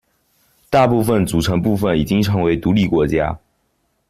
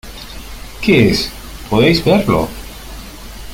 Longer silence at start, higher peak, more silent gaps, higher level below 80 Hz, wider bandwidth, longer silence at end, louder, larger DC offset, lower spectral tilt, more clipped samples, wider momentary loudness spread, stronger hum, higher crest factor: first, 0.7 s vs 0.05 s; second, -4 dBFS vs 0 dBFS; neither; second, -38 dBFS vs -32 dBFS; second, 15 kHz vs 17 kHz; first, 0.7 s vs 0 s; second, -17 LUFS vs -14 LUFS; neither; about the same, -6.5 dB/octave vs -5.5 dB/octave; neither; second, 4 LU vs 21 LU; neither; about the same, 14 dB vs 16 dB